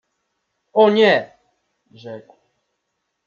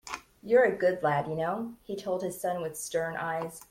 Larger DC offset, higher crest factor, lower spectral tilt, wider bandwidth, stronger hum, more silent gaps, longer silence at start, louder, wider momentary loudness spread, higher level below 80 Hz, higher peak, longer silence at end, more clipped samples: neither; about the same, 18 dB vs 18 dB; about the same, -6 dB/octave vs -5 dB/octave; second, 7.2 kHz vs 16.5 kHz; neither; neither; first, 0.75 s vs 0.05 s; first, -15 LUFS vs -30 LUFS; first, 25 LU vs 13 LU; second, -74 dBFS vs -66 dBFS; first, -2 dBFS vs -12 dBFS; first, 1.1 s vs 0.1 s; neither